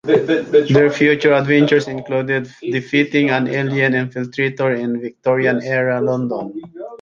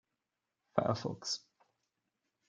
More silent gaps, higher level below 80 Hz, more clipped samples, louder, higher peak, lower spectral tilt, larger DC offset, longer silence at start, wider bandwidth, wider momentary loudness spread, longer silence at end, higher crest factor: neither; first, -58 dBFS vs -78 dBFS; neither; first, -17 LUFS vs -37 LUFS; first, -2 dBFS vs -12 dBFS; first, -7 dB/octave vs -4.5 dB/octave; neither; second, 0.05 s vs 0.75 s; second, 7.2 kHz vs 9.4 kHz; first, 10 LU vs 5 LU; second, 0.05 s vs 1.1 s; second, 16 dB vs 28 dB